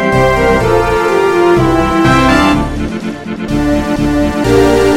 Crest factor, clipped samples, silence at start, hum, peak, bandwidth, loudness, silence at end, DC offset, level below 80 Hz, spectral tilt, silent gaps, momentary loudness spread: 10 dB; under 0.1%; 0 s; none; 0 dBFS; 16.5 kHz; -11 LUFS; 0 s; under 0.1%; -24 dBFS; -6 dB/octave; none; 9 LU